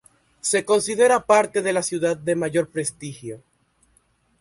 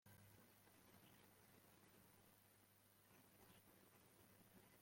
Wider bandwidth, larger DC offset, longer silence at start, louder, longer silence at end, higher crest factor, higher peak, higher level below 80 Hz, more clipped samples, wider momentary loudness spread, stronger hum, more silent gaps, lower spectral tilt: second, 11.5 kHz vs 16.5 kHz; neither; first, 0.45 s vs 0.05 s; first, -21 LUFS vs -69 LUFS; first, 1.05 s vs 0 s; about the same, 18 dB vs 16 dB; first, -4 dBFS vs -54 dBFS; first, -62 dBFS vs under -90 dBFS; neither; first, 17 LU vs 1 LU; neither; neither; about the same, -3.5 dB/octave vs -4 dB/octave